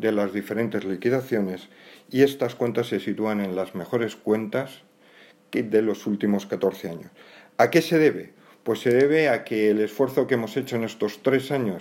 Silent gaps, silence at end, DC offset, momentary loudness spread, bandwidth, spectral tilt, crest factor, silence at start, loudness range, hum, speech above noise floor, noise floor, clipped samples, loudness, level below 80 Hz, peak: none; 0 s; under 0.1%; 10 LU; 16.5 kHz; -6 dB/octave; 20 dB; 0 s; 5 LU; none; 30 dB; -53 dBFS; under 0.1%; -24 LUFS; -74 dBFS; -4 dBFS